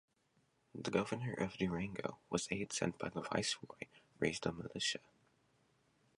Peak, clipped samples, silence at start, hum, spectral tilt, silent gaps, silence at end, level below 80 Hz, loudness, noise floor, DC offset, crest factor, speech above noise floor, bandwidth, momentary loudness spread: -18 dBFS; under 0.1%; 0.75 s; none; -4 dB/octave; none; 1.2 s; -68 dBFS; -40 LUFS; -78 dBFS; under 0.1%; 24 dB; 37 dB; 11.5 kHz; 9 LU